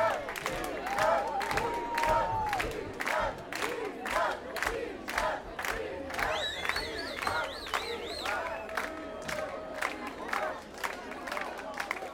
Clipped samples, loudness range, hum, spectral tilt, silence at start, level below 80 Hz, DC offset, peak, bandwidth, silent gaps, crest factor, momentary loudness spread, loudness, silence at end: under 0.1%; 5 LU; none; -3 dB/octave; 0 s; -52 dBFS; under 0.1%; -12 dBFS; 18 kHz; none; 22 dB; 8 LU; -33 LUFS; 0 s